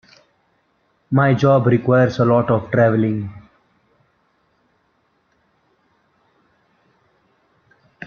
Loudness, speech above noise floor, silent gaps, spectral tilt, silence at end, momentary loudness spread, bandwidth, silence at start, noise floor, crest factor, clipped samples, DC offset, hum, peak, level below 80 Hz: -16 LUFS; 49 dB; none; -9 dB/octave; 0 s; 7 LU; 6.8 kHz; 1.1 s; -64 dBFS; 18 dB; under 0.1%; under 0.1%; none; -2 dBFS; -56 dBFS